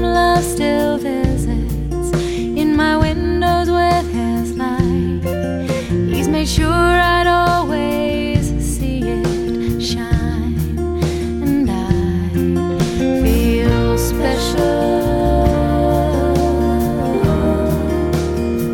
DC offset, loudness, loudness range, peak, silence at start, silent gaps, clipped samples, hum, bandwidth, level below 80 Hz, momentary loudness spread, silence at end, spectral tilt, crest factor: under 0.1%; -17 LUFS; 3 LU; 0 dBFS; 0 s; none; under 0.1%; none; 17.5 kHz; -24 dBFS; 6 LU; 0 s; -6 dB/octave; 16 dB